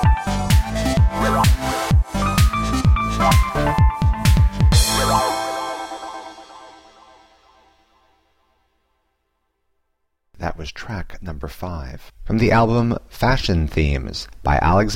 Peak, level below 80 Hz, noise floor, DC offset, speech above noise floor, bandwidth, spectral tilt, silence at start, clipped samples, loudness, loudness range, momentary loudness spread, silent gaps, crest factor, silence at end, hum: -2 dBFS; -24 dBFS; -71 dBFS; under 0.1%; 52 dB; 16.5 kHz; -5.5 dB/octave; 0 s; under 0.1%; -19 LUFS; 18 LU; 16 LU; none; 18 dB; 0 s; none